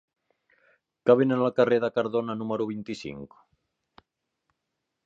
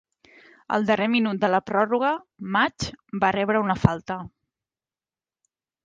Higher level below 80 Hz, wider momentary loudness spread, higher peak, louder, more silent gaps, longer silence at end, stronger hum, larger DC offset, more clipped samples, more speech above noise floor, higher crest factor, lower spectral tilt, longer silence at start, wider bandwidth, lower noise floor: second, -70 dBFS vs -50 dBFS; first, 15 LU vs 10 LU; second, -6 dBFS vs 0 dBFS; about the same, -25 LUFS vs -23 LUFS; neither; first, 1.8 s vs 1.55 s; neither; neither; neither; second, 57 dB vs over 67 dB; about the same, 22 dB vs 24 dB; first, -7.5 dB/octave vs -6 dB/octave; first, 1.05 s vs 0.7 s; second, 7.8 kHz vs 9.2 kHz; second, -82 dBFS vs under -90 dBFS